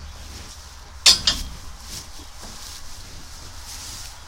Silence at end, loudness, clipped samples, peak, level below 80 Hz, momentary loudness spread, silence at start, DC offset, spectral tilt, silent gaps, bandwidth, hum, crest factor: 0 s; -17 LUFS; under 0.1%; 0 dBFS; -40 dBFS; 25 LU; 0 s; under 0.1%; 0 dB/octave; none; 16 kHz; none; 26 dB